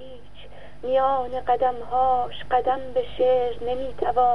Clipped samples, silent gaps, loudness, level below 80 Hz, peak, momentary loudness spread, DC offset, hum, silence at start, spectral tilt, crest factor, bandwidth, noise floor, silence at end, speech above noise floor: under 0.1%; none; -24 LUFS; -48 dBFS; -10 dBFS; 7 LU; 2%; 50 Hz at -45 dBFS; 0 s; -6.5 dB/octave; 14 dB; 5.6 kHz; -45 dBFS; 0 s; 23 dB